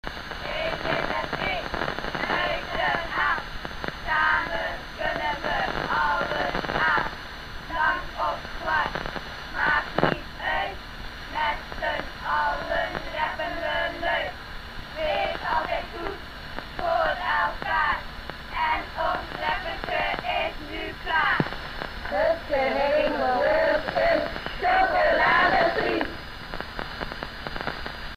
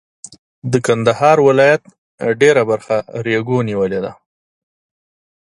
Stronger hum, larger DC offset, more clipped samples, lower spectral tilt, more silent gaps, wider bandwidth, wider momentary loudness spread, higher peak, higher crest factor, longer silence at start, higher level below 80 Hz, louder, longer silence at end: neither; first, 0.3% vs under 0.1%; neither; about the same, -5 dB/octave vs -5.5 dB/octave; second, none vs 1.98-2.18 s; first, 15.5 kHz vs 11.5 kHz; about the same, 12 LU vs 11 LU; second, -4 dBFS vs 0 dBFS; first, 22 dB vs 16 dB; second, 0.05 s vs 0.65 s; first, -42 dBFS vs -56 dBFS; second, -26 LUFS vs -15 LUFS; second, 0 s vs 1.3 s